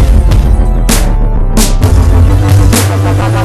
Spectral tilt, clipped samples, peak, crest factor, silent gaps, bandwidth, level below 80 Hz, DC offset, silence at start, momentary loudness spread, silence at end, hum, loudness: -5.5 dB/octave; 3%; 0 dBFS; 6 dB; none; 14 kHz; -8 dBFS; under 0.1%; 0 s; 4 LU; 0 s; none; -9 LUFS